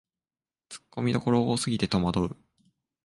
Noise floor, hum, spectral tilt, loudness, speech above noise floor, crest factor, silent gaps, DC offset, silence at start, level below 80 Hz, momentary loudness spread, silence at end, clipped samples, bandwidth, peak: under -90 dBFS; none; -6 dB/octave; -27 LUFS; over 63 dB; 18 dB; none; under 0.1%; 0.7 s; -52 dBFS; 21 LU; 0.7 s; under 0.1%; 11.5 kHz; -10 dBFS